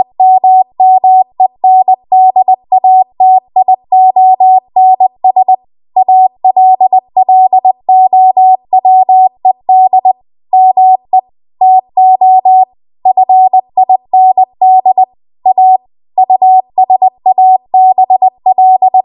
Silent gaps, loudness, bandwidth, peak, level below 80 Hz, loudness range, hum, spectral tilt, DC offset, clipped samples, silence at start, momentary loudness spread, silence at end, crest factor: none; -7 LUFS; 1.1 kHz; 0 dBFS; -66 dBFS; 1 LU; none; -9.5 dB/octave; under 0.1%; under 0.1%; 0 s; 6 LU; 0.05 s; 6 dB